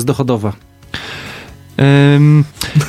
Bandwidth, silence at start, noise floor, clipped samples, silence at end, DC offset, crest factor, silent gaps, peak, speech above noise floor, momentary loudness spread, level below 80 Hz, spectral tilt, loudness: 14.5 kHz; 0 s; -33 dBFS; under 0.1%; 0 s; under 0.1%; 12 dB; none; 0 dBFS; 22 dB; 20 LU; -42 dBFS; -7 dB/octave; -11 LUFS